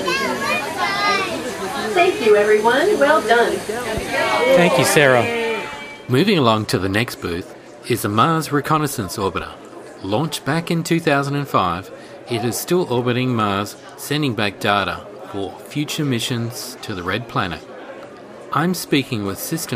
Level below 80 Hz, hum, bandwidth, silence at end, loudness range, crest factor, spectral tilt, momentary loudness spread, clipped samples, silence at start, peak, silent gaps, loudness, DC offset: -50 dBFS; none; 15.5 kHz; 0 s; 7 LU; 20 dB; -4.5 dB/octave; 15 LU; under 0.1%; 0 s; 0 dBFS; none; -19 LUFS; under 0.1%